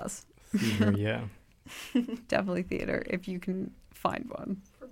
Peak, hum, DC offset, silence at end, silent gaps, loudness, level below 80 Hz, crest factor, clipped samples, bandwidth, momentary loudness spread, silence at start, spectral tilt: -12 dBFS; none; under 0.1%; 0 s; none; -32 LUFS; -56 dBFS; 20 dB; under 0.1%; 16.5 kHz; 14 LU; 0 s; -6 dB/octave